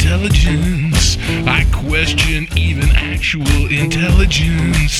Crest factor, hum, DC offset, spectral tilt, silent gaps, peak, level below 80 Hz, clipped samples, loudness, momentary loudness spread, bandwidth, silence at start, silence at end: 12 dB; none; under 0.1%; -4.5 dB/octave; none; 0 dBFS; -16 dBFS; under 0.1%; -14 LUFS; 3 LU; 14 kHz; 0 s; 0 s